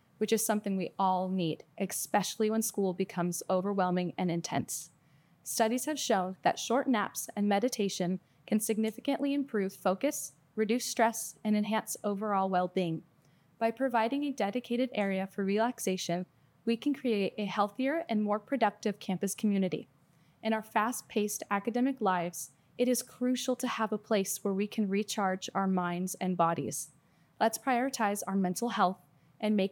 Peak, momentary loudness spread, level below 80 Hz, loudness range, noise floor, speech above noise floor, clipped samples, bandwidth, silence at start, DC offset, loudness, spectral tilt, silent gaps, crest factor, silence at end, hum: -14 dBFS; 6 LU; -84 dBFS; 1 LU; -65 dBFS; 34 dB; under 0.1%; 19 kHz; 0.2 s; under 0.1%; -32 LUFS; -4.5 dB/octave; none; 18 dB; 0 s; none